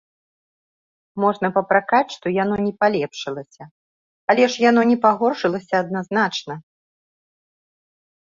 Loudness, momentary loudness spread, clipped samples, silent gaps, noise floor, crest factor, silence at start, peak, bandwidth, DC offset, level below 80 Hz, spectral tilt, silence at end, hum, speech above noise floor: -19 LUFS; 14 LU; under 0.1%; 3.71-4.28 s; under -90 dBFS; 20 dB; 1.15 s; -2 dBFS; 7.6 kHz; under 0.1%; -64 dBFS; -5.5 dB/octave; 1.7 s; none; over 71 dB